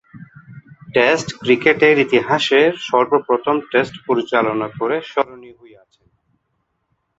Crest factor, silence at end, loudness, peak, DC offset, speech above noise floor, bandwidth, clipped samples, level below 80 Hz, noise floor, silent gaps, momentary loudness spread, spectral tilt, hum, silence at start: 18 dB; 1.65 s; -16 LUFS; 0 dBFS; under 0.1%; 54 dB; 8 kHz; under 0.1%; -60 dBFS; -70 dBFS; none; 9 LU; -5 dB/octave; none; 0.15 s